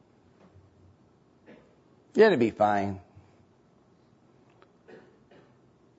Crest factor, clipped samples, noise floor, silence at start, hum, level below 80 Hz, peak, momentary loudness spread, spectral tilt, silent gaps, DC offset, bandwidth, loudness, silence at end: 24 dB; under 0.1%; -62 dBFS; 2.15 s; none; -72 dBFS; -8 dBFS; 14 LU; -7 dB/octave; none; under 0.1%; 8 kHz; -24 LUFS; 3 s